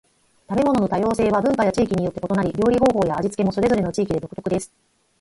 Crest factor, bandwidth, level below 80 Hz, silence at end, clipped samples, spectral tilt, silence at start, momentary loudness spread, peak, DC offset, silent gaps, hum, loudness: 16 dB; 11.5 kHz; -46 dBFS; 0.55 s; under 0.1%; -7 dB/octave; 0.5 s; 8 LU; -6 dBFS; under 0.1%; none; none; -21 LUFS